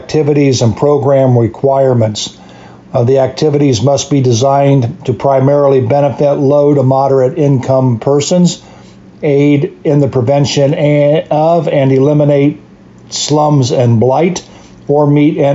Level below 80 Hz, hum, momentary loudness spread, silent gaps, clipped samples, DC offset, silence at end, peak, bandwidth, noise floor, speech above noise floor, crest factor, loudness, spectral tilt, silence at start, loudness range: -48 dBFS; none; 6 LU; none; under 0.1%; under 0.1%; 0 s; 0 dBFS; 8 kHz; -36 dBFS; 27 dB; 10 dB; -10 LUFS; -6.5 dB/octave; 0 s; 2 LU